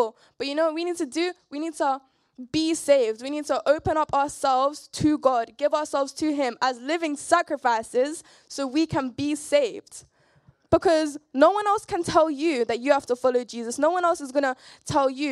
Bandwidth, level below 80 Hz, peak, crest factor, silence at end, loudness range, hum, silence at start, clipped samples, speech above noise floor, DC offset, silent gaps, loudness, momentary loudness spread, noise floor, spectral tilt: 13 kHz; -56 dBFS; -4 dBFS; 20 dB; 0 s; 3 LU; none; 0 s; under 0.1%; 36 dB; under 0.1%; none; -24 LUFS; 9 LU; -60 dBFS; -4 dB/octave